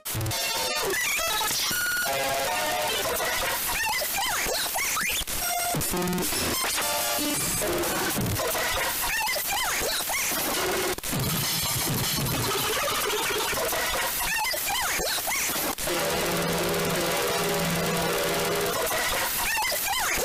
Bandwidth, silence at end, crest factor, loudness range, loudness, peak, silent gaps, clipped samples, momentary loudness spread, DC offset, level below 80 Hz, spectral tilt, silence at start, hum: 16 kHz; 0 s; 12 dB; 0 LU; -25 LUFS; -16 dBFS; none; under 0.1%; 2 LU; under 0.1%; -46 dBFS; -2 dB/octave; 0.05 s; none